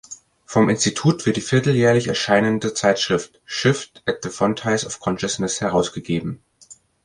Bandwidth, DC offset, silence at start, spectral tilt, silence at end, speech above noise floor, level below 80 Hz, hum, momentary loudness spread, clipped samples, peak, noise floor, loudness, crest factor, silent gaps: 11.5 kHz; under 0.1%; 0.1 s; -4.5 dB/octave; 0.3 s; 29 dB; -52 dBFS; none; 9 LU; under 0.1%; -4 dBFS; -49 dBFS; -20 LUFS; 18 dB; none